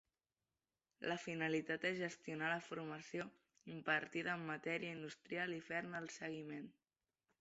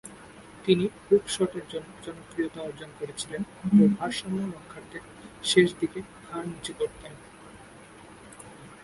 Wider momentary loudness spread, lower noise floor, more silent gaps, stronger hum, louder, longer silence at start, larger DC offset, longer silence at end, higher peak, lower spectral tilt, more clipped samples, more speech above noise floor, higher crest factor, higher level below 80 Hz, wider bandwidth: second, 11 LU vs 26 LU; first, under -90 dBFS vs -49 dBFS; neither; neither; second, -44 LUFS vs -27 LUFS; first, 1 s vs 0.05 s; neither; first, 0.7 s vs 0.1 s; second, -24 dBFS vs -6 dBFS; second, -3.5 dB/octave vs -5 dB/octave; neither; first, over 45 dB vs 21 dB; about the same, 22 dB vs 22 dB; second, -86 dBFS vs -60 dBFS; second, 8 kHz vs 11.5 kHz